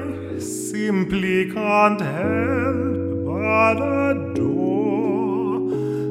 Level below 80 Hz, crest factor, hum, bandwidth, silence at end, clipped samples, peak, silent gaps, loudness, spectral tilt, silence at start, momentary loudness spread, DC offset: -52 dBFS; 18 dB; none; 15 kHz; 0 s; under 0.1%; -2 dBFS; none; -21 LUFS; -6.5 dB/octave; 0 s; 7 LU; under 0.1%